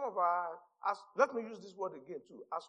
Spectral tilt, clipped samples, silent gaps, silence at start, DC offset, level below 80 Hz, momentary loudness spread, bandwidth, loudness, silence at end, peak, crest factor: -4.5 dB/octave; under 0.1%; none; 0 s; under 0.1%; under -90 dBFS; 15 LU; 9.4 kHz; -37 LUFS; 0 s; -14 dBFS; 24 dB